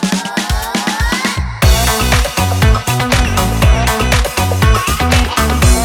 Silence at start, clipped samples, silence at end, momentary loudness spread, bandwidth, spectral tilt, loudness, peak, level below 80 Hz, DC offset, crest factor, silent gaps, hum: 0 s; under 0.1%; 0 s; 5 LU; 19.5 kHz; -4 dB/octave; -13 LUFS; 0 dBFS; -16 dBFS; under 0.1%; 12 dB; none; none